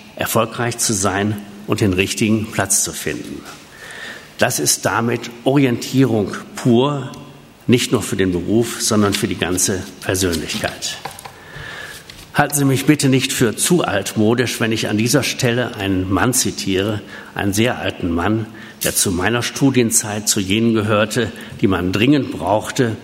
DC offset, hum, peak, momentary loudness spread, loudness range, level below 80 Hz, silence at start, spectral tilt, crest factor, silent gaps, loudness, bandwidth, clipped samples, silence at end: under 0.1%; none; 0 dBFS; 14 LU; 3 LU; -48 dBFS; 0 s; -4 dB/octave; 18 dB; none; -17 LUFS; 16 kHz; under 0.1%; 0 s